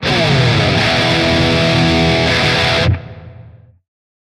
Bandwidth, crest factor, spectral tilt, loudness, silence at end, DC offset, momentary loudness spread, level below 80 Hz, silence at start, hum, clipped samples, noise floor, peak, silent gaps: 13 kHz; 14 dB; -5 dB/octave; -12 LUFS; 0.75 s; under 0.1%; 1 LU; -32 dBFS; 0 s; none; under 0.1%; -40 dBFS; 0 dBFS; none